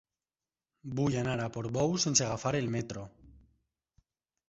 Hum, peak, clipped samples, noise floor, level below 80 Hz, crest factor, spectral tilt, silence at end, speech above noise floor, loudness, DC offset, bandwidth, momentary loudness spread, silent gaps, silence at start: none; -12 dBFS; under 0.1%; under -90 dBFS; -60 dBFS; 22 dB; -4 dB/octave; 1.2 s; over 58 dB; -31 LUFS; under 0.1%; 8 kHz; 16 LU; none; 0.85 s